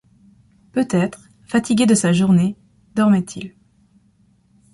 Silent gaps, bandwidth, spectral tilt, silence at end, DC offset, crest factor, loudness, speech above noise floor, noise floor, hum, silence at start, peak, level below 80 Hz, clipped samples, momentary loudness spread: none; 11.5 kHz; -6 dB/octave; 1.25 s; under 0.1%; 16 dB; -18 LUFS; 41 dB; -57 dBFS; none; 0.75 s; -4 dBFS; -56 dBFS; under 0.1%; 16 LU